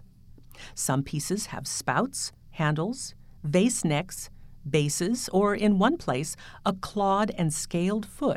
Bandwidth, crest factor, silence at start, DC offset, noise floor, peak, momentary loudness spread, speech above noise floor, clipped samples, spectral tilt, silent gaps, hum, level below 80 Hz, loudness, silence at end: 16 kHz; 18 dB; 0.4 s; under 0.1%; -50 dBFS; -10 dBFS; 13 LU; 23 dB; under 0.1%; -5 dB/octave; none; none; -50 dBFS; -27 LUFS; 0 s